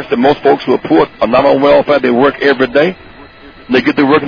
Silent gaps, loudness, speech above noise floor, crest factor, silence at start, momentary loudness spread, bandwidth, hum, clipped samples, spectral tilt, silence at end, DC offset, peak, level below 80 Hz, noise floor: none; -10 LUFS; 25 dB; 10 dB; 0 s; 4 LU; 5.4 kHz; none; under 0.1%; -7 dB/octave; 0 s; under 0.1%; 0 dBFS; -42 dBFS; -35 dBFS